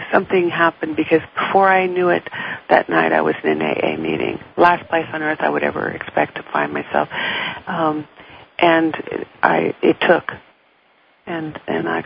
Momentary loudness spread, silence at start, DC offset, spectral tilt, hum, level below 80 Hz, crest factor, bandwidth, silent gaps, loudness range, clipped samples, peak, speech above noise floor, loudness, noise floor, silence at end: 12 LU; 0 s; under 0.1%; -8.5 dB/octave; none; -56 dBFS; 18 dB; 5.2 kHz; none; 4 LU; under 0.1%; 0 dBFS; 38 dB; -18 LUFS; -56 dBFS; 0 s